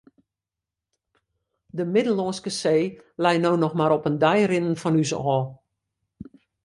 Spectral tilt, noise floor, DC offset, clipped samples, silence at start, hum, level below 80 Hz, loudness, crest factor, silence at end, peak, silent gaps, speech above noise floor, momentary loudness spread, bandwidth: -6 dB/octave; -88 dBFS; under 0.1%; under 0.1%; 1.75 s; none; -64 dBFS; -23 LUFS; 18 dB; 0.4 s; -6 dBFS; none; 66 dB; 7 LU; 11.5 kHz